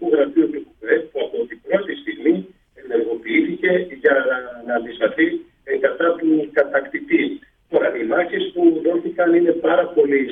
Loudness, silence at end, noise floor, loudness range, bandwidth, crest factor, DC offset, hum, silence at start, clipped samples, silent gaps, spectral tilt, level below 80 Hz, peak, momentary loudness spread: -19 LUFS; 0 s; -39 dBFS; 3 LU; 3.9 kHz; 16 dB; under 0.1%; none; 0 s; under 0.1%; none; -8.5 dB/octave; -62 dBFS; -4 dBFS; 8 LU